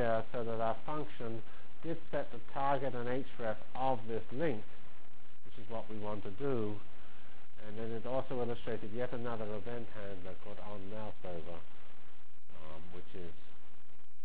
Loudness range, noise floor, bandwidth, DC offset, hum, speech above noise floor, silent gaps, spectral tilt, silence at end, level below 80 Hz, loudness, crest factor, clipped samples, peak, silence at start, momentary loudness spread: 11 LU; -65 dBFS; 4 kHz; 4%; none; 25 dB; none; -9.5 dB/octave; 0 s; -64 dBFS; -41 LUFS; 22 dB; under 0.1%; -18 dBFS; 0 s; 22 LU